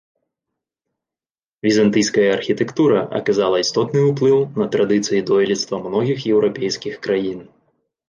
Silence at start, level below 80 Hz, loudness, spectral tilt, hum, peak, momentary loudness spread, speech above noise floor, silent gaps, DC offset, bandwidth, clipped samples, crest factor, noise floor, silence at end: 1.65 s; -60 dBFS; -18 LUFS; -5 dB/octave; none; -4 dBFS; 6 LU; over 73 dB; none; under 0.1%; 9.8 kHz; under 0.1%; 14 dB; under -90 dBFS; 0.65 s